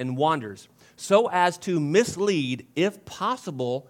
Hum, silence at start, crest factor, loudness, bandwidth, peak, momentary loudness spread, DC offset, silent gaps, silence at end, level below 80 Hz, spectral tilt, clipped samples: none; 0 s; 20 dB; -24 LUFS; 16.5 kHz; -4 dBFS; 8 LU; under 0.1%; none; 0.1 s; -68 dBFS; -5 dB/octave; under 0.1%